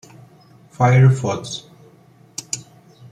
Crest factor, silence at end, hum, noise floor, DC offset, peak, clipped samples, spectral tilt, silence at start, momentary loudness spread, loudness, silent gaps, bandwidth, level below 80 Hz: 18 dB; 0.5 s; none; -50 dBFS; under 0.1%; -2 dBFS; under 0.1%; -6 dB/octave; 0.8 s; 20 LU; -18 LUFS; none; 9.8 kHz; -56 dBFS